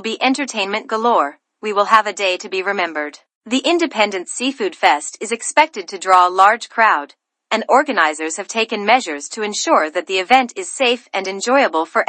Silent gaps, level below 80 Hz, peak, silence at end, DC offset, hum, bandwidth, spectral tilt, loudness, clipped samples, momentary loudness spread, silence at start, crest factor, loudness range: 3.35-3.41 s; -70 dBFS; 0 dBFS; 0.05 s; under 0.1%; none; 11 kHz; -1.5 dB/octave; -17 LUFS; under 0.1%; 10 LU; 0 s; 18 dB; 3 LU